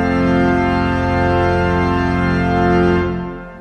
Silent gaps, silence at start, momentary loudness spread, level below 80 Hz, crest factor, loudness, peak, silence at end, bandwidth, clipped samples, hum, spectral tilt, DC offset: none; 0 s; 4 LU; -30 dBFS; 12 dB; -16 LUFS; -2 dBFS; 0 s; 9 kHz; under 0.1%; none; -8 dB/octave; under 0.1%